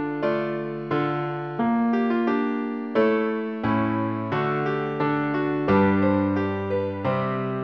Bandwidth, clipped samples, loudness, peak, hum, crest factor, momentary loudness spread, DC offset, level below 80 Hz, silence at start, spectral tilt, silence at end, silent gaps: 6 kHz; under 0.1%; -24 LUFS; -8 dBFS; none; 16 dB; 6 LU; 0.1%; -58 dBFS; 0 s; -9.5 dB/octave; 0 s; none